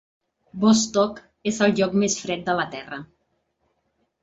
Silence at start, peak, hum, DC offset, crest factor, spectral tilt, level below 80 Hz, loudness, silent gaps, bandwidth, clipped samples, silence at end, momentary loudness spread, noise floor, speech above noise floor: 0.55 s; -6 dBFS; none; under 0.1%; 18 dB; -4 dB/octave; -60 dBFS; -22 LUFS; none; 8 kHz; under 0.1%; 1.15 s; 16 LU; -72 dBFS; 50 dB